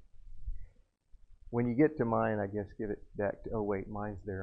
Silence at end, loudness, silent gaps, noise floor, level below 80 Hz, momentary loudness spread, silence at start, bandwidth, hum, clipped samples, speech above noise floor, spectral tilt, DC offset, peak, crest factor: 0 s; -34 LUFS; none; -60 dBFS; -50 dBFS; 20 LU; 0.15 s; 4.9 kHz; none; under 0.1%; 27 dB; -11 dB/octave; under 0.1%; -16 dBFS; 20 dB